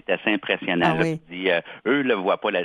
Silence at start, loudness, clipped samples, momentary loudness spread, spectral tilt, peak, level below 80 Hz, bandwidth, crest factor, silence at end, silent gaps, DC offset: 0.1 s; -23 LUFS; under 0.1%; 4 LU; -6.5 dB/octave; -4 dBFS; -60 dBFS; 10 kHz; 18 dB; 0 s; none; under 0.1%